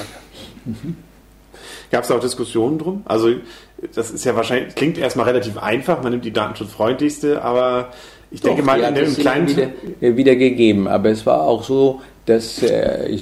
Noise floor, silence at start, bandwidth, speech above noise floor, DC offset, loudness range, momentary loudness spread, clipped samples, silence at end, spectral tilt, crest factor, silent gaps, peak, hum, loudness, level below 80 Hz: -45 dBFS; 0 s; 15 kHz; 27 dB; under 0.1%; 6 LU; 15 LU; under 0.1%; 0 s; -5.5 dB/octave; 18 dB; none; 0 dBFS; none; -18 LUFS; -48 dBFS